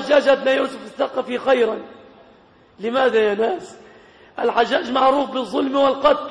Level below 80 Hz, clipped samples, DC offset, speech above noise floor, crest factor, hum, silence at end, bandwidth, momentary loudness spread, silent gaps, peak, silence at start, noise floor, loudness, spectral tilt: -58 dBFS; under 0.1%; under 0.1%; 32 dB; 16 dB; none; 0 s; 10 kHz; 10 LU; none; -4 dBFS; 0 s; -51 dBFS; -19 LUFS; -4.5 dB/octave